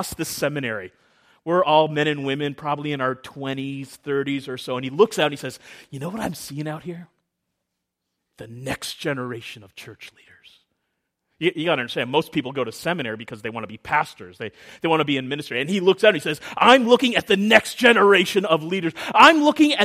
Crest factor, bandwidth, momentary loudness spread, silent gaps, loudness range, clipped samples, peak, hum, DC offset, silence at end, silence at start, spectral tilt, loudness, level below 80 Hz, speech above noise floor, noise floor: 22 dB; 15.5 kHz; 20 LU; none; 16 LU; under 0.1%; 0 dBFS; none; under 0.1%; 0 s; 0 s; -4.5 dB/octave; -20 LUFS; -60 dBFS; 59 dB; -80 dBFS